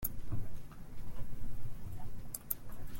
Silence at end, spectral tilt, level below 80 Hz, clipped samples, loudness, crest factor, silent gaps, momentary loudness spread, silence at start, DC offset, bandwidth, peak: 0 s; -5 dB/octave; -46 dBFS; under 0.1%; -46 LUFS; 18 dB; none; 12 LU; 0 s; under 0.1%; 17 kHz; -14 dBFS